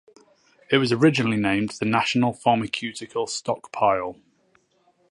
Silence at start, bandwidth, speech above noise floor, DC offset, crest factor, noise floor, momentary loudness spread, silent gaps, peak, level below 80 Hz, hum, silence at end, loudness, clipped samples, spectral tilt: 0.7 s; 11.5 kHz; 42 dB; under 0.1%; 20 dB; -64 dBFS; 10 LU; none; -4 dBFS; -60 dBFS; none; 0.95 s; -23 LUFS; under 0.1%; -5 dB/octave